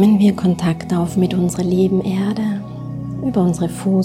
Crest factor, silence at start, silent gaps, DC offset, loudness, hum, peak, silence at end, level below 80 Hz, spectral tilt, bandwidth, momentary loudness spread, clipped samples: 14 dB; 0 s; none; under 0.1%; -18 LUFS; none; -4 dBFS; 0 s; -46 dBFS; -7.5 dB/octave; 15 kHz; 10 LU; under 0.1%